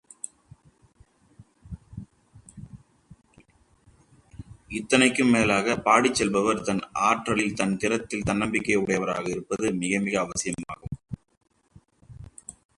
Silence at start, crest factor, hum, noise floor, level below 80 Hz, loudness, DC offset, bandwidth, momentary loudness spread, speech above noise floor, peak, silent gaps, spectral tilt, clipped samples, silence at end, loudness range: 1.4 s; 24 dB; none; -60 dBFS; -52 dBFS; -24 LUFS; under 0.1%; 11.5 kHz; 24 LU; 36 dB; -4 dBFS; 11.37-11.41 s; -4 dB/octave; under 0.1%; 0.25 s; 8 LU